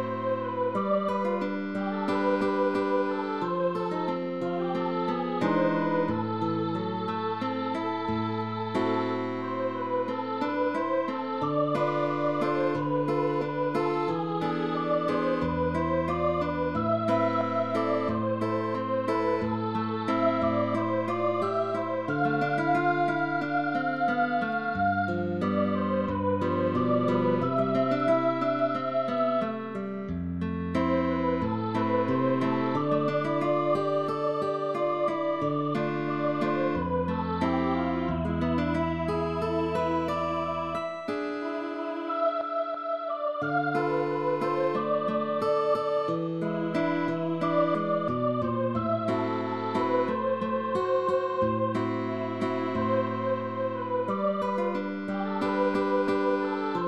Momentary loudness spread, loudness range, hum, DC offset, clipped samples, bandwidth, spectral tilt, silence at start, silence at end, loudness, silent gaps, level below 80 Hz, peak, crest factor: 5 LU; 3 LU; none; 0.2%; under 0.1%; 11 kHz; -8 dB/octave; 0 s; 0 s; -28 LUFS; none; -56 dBFS; -12 dBFS; 14 dB